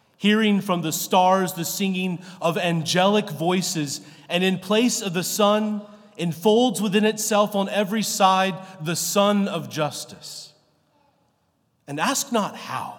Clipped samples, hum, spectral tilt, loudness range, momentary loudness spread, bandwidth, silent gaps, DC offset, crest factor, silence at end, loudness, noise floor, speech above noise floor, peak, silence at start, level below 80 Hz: under 0.1%; none; -4 dB/octave; 5 LU; 11 LU; 18 kHz; none; under 0.1%; 18 dB; 0 s; -22 LUFS; -68 dBFS; 46 dB; -4 dBFS; 0.2 s; -80 dBFS